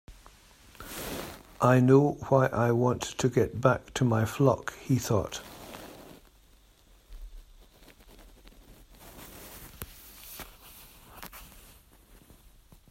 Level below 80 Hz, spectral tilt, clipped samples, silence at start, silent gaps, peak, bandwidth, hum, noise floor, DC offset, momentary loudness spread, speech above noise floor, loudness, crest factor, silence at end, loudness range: -54 dBFS; -6.5 dB/octave; under 0.1%; 0.1 s; none; -8 dBFS; 16 kHz; none; -60 dBFS; under 0.1%; 25 LU; 34 dB; -27 LUFS; 22 dB; 1.45 s; 22 LU